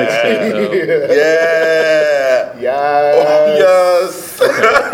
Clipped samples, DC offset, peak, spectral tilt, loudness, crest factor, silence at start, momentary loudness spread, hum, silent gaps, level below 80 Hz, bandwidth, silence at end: under 0.1%; under 0.1%; 0 dBFS; -4 dB/octave; -12 LUFS; 12 dB; 0 s; 6 LU; none; none; -56 dBFS; 17 kHz; 0 s